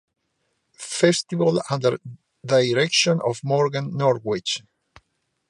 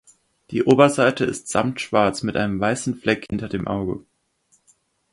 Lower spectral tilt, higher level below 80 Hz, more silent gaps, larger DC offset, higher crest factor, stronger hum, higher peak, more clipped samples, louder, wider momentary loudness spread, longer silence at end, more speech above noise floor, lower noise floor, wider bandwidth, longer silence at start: about the same, -4.5 dB/octave vs -5.5 dB/octave; second, -66 dBFS vs -50 dBFS; neither; neither; about the same, 20 dB vs 22 dB; neither; about the same, -2 dBFS vs 0 dBFS; neither; about the same, -21 LUFS vs -21 LUFS; about the same, 11 LU vs 12 LU; second, 0.9 s vs 1.15 s; first, 52 dB vs 44 dB; first, -73 dBFS vs -64 dBFS; about the same, 11.5 kHz vs 11.5 kHz; first, 0.8 s vs 0.5 s